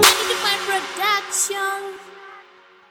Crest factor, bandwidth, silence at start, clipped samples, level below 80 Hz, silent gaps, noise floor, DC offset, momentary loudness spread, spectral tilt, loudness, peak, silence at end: 22 dB; 18 kHz; 0 s; under 0.1%; -56 dBFS; none; -49 dBFS; under 0.1%; 19 LU; 0.5 dB/octave; -20 LUFS; 0 dBFS; 0.5 s